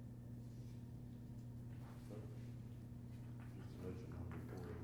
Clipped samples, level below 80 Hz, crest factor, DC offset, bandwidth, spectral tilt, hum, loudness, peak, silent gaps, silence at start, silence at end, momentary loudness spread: under 0.1%; -64 dBFS; 12 dB; under 0.1%; 19.5 kHz; -8 dB/octave; none; -53 LUFS; -40 dBFS; none; 0 s; 0 s; 4 LU